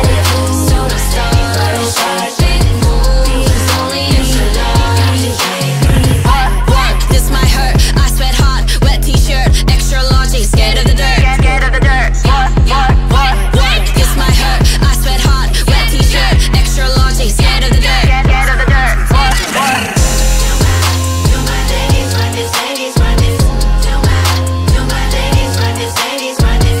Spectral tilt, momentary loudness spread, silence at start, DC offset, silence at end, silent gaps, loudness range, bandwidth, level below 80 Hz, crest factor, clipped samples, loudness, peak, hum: -4.5 dB/octave; 3 LU; 0 s; under 0.1%; 0 s; none; 2 LU; 16.5 kHz; -12 dBFS; 10 dB; under 0.1%; -11 LUFS; 0 dBFS; none